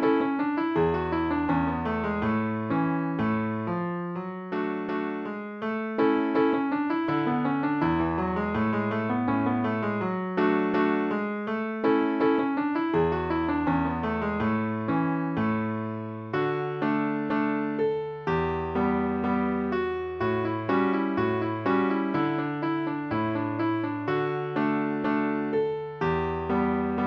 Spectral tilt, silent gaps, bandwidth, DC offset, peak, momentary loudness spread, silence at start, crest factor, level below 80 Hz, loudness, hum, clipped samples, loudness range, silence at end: -9 dB/octave; none; 6 kHz; under 0.1%; -12 dBFS; 5 LU; 0 s; 14 dB; -54 dBFS; -27 LUFS; none; under 0.1%; 2 LU; 0 s